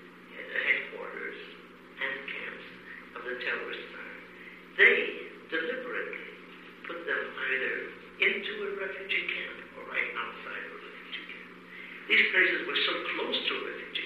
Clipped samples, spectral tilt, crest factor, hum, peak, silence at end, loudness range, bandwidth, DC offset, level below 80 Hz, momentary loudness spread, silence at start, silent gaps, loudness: under 0.1%; -4 dB/octave; 24 dB; none; -8 dBFS; 0 s; 7 LU; 13.5 kHz; under 0.1%; -74 dBFS; 21 LU; 0 s; none; -30 LUFS